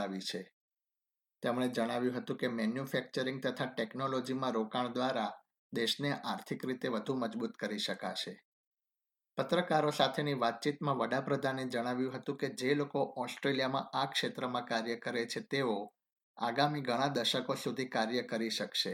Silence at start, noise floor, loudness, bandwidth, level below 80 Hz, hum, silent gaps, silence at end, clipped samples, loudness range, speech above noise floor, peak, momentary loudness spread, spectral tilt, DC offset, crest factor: 0 s; under -90 dBFS; -35 LUFS; 17 kHz; -84 dBFS; none; 0.53-0.69 s, 5.59-5.70 s, 8.45-8.71 s, 16.12-16.16 s, 16.23-16.34 s; 0 s; under 0.1%; 3 LU; over 55 dB; -14 dBFS; 7 LU; -4.5 dB/octave; under 0.1%; 22 dB